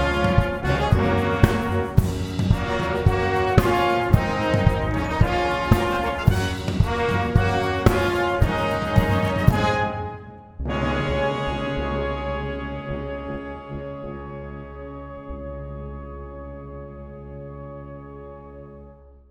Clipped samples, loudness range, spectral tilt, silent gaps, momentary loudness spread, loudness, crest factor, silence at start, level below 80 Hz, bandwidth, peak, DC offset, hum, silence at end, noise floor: under 0.1%; 15 LU; -7 dB/octave; none; 18 LU; -22 LUFS; 22 dB; 0 s; -32 dBFS; 17 kHz; 0 dBFS; under 0.1%; none; 0.2 s; -46 dBFS